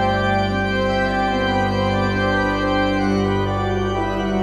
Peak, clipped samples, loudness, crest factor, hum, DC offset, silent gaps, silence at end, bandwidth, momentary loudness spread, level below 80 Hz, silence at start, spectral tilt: -6 dBFS; under 0.1%; -19 LUFS; 12 dB; 50 Hz at -50 dBFS; under 0.1%; none; 0 s; 10 kHz; 2 LU; -34 dBFS; 0 s; -6.5 dB/octave